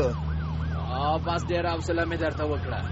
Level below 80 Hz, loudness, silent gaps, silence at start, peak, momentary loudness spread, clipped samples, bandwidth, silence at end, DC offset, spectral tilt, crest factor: -36 dBFS; -28 LUFS; none; 0 s; -12 dBFS; 4 LU; under 0.1%; 8 kHz; 0 s; under 0.1%; -5.5 dB/octave; 14 dB